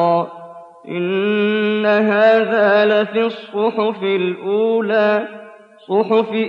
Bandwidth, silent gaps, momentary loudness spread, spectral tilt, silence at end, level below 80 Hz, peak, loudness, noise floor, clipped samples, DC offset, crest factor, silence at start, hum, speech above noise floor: 5.6 kHz; none; 8 LU; -7.5 dB/octave; 0 s; -74 dBFS; -4 dBFS; -16 LUFS; -37 dBFS; under 0.1%; under 0.1%; 12 dB; 0 s; none; 21 dB